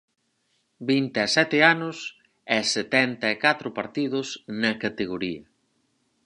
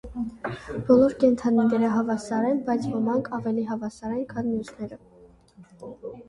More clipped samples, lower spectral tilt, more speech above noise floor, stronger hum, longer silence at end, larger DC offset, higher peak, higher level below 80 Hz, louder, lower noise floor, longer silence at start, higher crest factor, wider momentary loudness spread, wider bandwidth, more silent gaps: neither; second, -3.5 dB/octave vs -7.5 dB/octave; first, 47 dB vs 28 dB; neither; first, 0.85 s vs 0.05 s; neither; first, -2 dBFS vs -6 dBFS; second, -66 dBFS vs -54 dBFS; about the same, -24 LUFS vs -25 LUFS; first, -71 dBFS vs -52 dBFS; first, 0.8 s vs 0.05 s; about the same, 24 dB vs 20 dB; second, 14 LU vs 18 LU; about the same, 11 kHz vs 10.5 kHz; neither